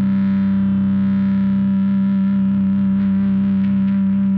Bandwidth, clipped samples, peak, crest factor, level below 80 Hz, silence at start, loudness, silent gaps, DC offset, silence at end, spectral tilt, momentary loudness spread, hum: 3.9 kHz; under 0.1%; -12 dBFS; 4 dB; -50 dBFS; 0 s; -17 LUFS; none; under 0.1%; 0 s; -10 dB/octave; 0 LU; none